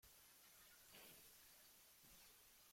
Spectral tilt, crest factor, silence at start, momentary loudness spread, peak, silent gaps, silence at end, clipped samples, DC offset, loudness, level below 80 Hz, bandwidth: -1 dB/octave; 16 dB; 0 s; 4 LU; -52 dBFS; none; 0 s; under 0.1%; under 0.1%; -65 LUFS; -84 dBFS; 16.5 kHz